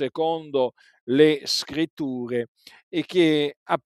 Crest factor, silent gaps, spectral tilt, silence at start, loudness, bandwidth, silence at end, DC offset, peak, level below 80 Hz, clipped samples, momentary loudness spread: 20 dB; 1.01-1.07 s, 1.90-1.97 s, 2.48-2.55 s, 2.83-2.91 s, 3.56-3.66 s; -5 dB/octave; 0 s; -23 LUFS; 13.5 kHz; 0.1 s; under 0.1%; -4 dBFS; -68 dBFS; under 0.1%; 11 LU